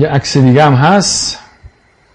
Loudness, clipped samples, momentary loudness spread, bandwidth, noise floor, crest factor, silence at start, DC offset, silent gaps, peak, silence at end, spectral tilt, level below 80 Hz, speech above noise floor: -9 LUFS; under 0.1%; 9 LU; 10.5 kHz; -41 dBFS; 10 dB; 0 s; under 0.1%; none; 0 dBFS; 0.75 s; -5 dB/octave; -42 dBFS; 32 dB